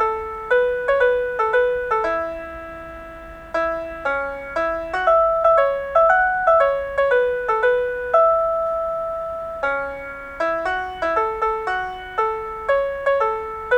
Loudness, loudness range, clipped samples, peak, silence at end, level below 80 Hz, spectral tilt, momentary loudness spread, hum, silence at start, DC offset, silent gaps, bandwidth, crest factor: -20 LUFS; 6 LU; under 0.1%; -4 dBFS; 0 s; -46 dBFS; -5 dB/octave; 12 LU; none; 0 s; under 0.1%; none; 9.2 kHz; 16 dB